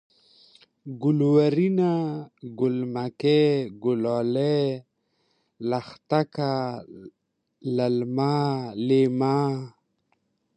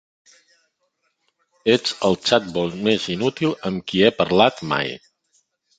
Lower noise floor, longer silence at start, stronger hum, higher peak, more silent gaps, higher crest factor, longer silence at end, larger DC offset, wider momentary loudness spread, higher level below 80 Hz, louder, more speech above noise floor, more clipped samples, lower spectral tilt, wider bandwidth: about the same, -72 dBFS vs -71 dBFS; second, 0.85 s vs 1.65 s; neither; second, -8 dBFS vs -2 dBFS; neither; about the same, 18 dB vs 20 dB; about the same, 0.9 s vs 0.8 s; neither; first, 16 LU vs 9 LU; second, -70 dBFS vs -56 dBFS; second, -24 LUFS vs -20 LUFS; about the same, 48 dB vs 51 dB; neither; first, -8.5 dB/octave vs -5 dB/octave; about the same, 9.4 kHz vs 9.2 kHz